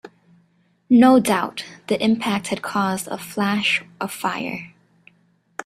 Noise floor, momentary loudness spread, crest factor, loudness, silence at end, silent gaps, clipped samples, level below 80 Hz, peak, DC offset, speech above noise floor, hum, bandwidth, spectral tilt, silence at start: -61 dBFS; 16 LU; 20 dB; -20 LUFS; 0.05 s; none; under 0.1%; -62 dBFS; -2 dBFS; under 0.1%; 42 dB; none; 14.5 kHz; -4.5 dB/octave; 0.05 s